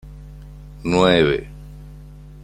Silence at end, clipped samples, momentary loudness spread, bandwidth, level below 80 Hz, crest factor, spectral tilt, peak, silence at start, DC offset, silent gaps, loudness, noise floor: 0 s; under 0.1%; 26 LU; 11 kHz; -38 dBFS; 20 dB; -6 dB/octave; -2 dBFS; 0.05 s; under 0.1%; none; -18 LUFS; -39 dBFS